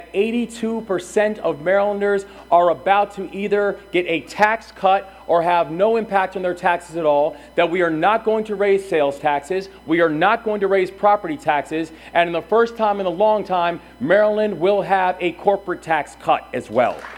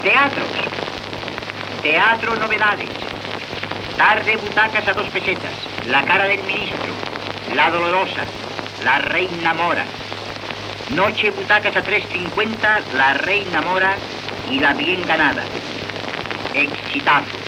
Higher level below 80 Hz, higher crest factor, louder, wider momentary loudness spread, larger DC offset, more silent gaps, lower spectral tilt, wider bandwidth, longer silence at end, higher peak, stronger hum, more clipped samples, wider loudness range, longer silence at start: about the same, -54 dBFS vs -50 dBFS; about the same, 18 dB vs 16 dB; about the same, -19 LUFS vs -18 LUFS; second, 6 LU vs 12 LU; neither; neither; first, -5.5 dB/octave vs -4 dB/octave; second, 13.5 kHz vs 16.5 kHz; about the same, 0 s vs 0 s; first, 0 dBFS vs -4 dBFS; neither; neither; about the same, 1 LU vs 2 LU; about the same, 0 s vs 0 s